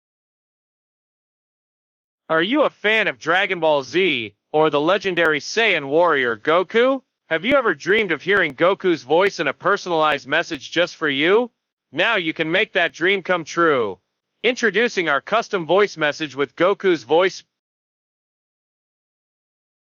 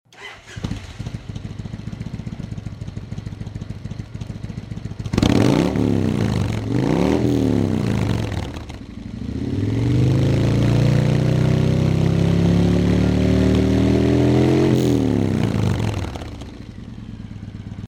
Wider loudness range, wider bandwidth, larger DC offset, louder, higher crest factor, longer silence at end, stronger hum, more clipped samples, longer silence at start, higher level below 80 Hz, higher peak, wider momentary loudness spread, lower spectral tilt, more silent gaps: second, 4 LU vs 14 LU; second, 7.6 kHz vs 15 kHz; neither; about the same, -19 LUFS vs -18 LUFS; about the same, 16 dB vs 16 dB; first, 2.6 s vs 0 s; neither; neither; first, 2.3 s vs 0.2 s; second, -64 dBFS vs -32 dBFS; about the same, -4 dBFS vs -4 dBFS; second, 5 LU vs 17 LU; second, -4 dB/octave vs -7.5 dB/octave; first, 11.72-11.77 s vs none